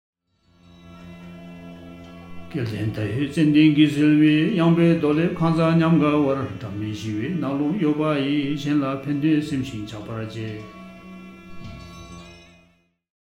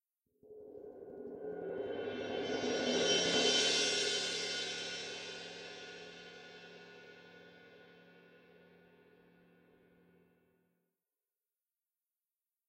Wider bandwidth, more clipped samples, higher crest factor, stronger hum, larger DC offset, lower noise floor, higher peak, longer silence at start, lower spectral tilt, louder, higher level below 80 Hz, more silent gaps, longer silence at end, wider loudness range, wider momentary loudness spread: second, 10.5 kHz vs 12.5 kHz; neither; about the same, 18 dB vs 22 dB; neither; neither; second, -61 dBFS vs under -90 dBFS; first, -4 dBFS vs -20 dBFS; first, 0.85 s vs 0.45 s; first, -7.5 dB/octave vs -1.5 dB/octave; first, -21 LUFS vs -34 LUFS; first, -54 dBFS vs -78 dBFS; neither; second, 0.9 s vs 4.1 s; second, 15 LU vs 21 LU; about the same, 24 LU vs 25 LU